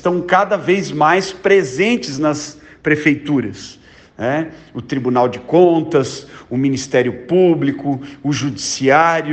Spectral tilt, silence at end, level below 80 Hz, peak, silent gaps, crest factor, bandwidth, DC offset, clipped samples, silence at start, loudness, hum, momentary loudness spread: -5 dB/octave; 0 s; -54 dBFS; 0 dBFS; none; 16 dB; 8.8 kHz; under 0.1%; under 0.1%; 0.05 s; -16 LUFS; none; 12 LU